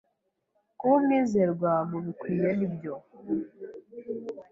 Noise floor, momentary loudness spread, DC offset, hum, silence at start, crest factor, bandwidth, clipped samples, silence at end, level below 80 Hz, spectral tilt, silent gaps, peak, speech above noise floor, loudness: -77 dBFS; 18 LU; under 0.1%; none; 0.8 s; 18 dB; 7.6 kHz; under 0.1%; 0.1 s; -68 dBFS; -9 dB/octave; none; -10 dBFS; 49 dB; -28 LUFS